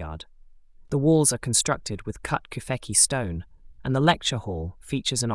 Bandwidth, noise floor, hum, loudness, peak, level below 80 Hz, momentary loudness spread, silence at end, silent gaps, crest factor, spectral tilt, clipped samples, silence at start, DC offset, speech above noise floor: 12 kHz; -50 dBFS; none; -24 LUFS; -6 dBFS; -46 dBFS; 14 LU; 0 s; none; 20 dB; -3.5 dB/octave; under 0.1%; 0 s; under 0.1%; 25 dB